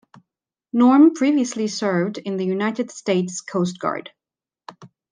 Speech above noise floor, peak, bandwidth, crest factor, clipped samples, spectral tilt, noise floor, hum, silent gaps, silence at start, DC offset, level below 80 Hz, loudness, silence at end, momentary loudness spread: 71 dB; -4 dBFS; 10 kHz; 16 dB; under 0.1%; -5.5 dB/octave; -90 dBFS; none; none; 0.75 s; under 0.1%; -74 dBFS; -20 LUFS; 0.25 s; 13 LU